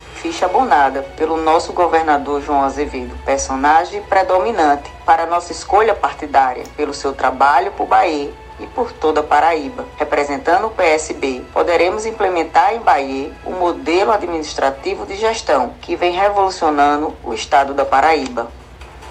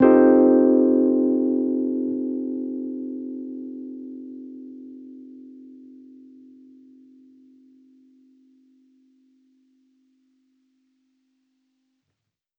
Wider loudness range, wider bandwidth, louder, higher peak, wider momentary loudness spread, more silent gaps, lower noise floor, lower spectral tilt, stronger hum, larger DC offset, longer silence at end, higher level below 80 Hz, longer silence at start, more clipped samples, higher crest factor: second, 2 LU vs 26 LU; first, 10.5 kHz vs 2.8 kHz; first, -16 LUFS vs -20 LUFS; first, 0 dBFS vs -4 dBFS; second, 10 LU vs 27 LU; neither; second, -36 dBFS vs -80 dBFS; second, -3.5 dB/octave vs -8 dB/octave; neither; neither; second, 0 s vs 6.85 s; first, -40 dBFS vs -66 dBFS; about the same, 0 s vs 0 s; neither; about the same, 16 dB vs 20 dB